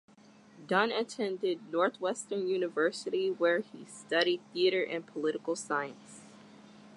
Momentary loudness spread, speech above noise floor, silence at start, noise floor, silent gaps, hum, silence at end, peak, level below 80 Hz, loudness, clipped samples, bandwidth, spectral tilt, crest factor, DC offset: 9 LU; 26 dB; 0.55 s; -58 dBFS; none; none; 0 s; -12 dBFS; -86 dBFS; -32 LUFS; under 0.1%; 11.5 kHz; -3.5 dB/octave; 20 dB; under 0.1%